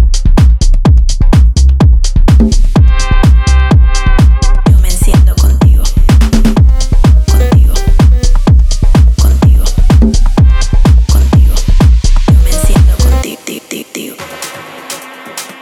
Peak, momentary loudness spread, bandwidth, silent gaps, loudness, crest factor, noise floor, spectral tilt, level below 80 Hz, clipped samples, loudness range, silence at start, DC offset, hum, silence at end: 0 dBFS; 14 LU; 13.5 kHz; none; -9 LUFS; 6 dB; -26 dBFS; -6 dB/octave; -6 dBFS; under 0.1%; 2 LU; 0 s; under 0.1%; none; 0.1 s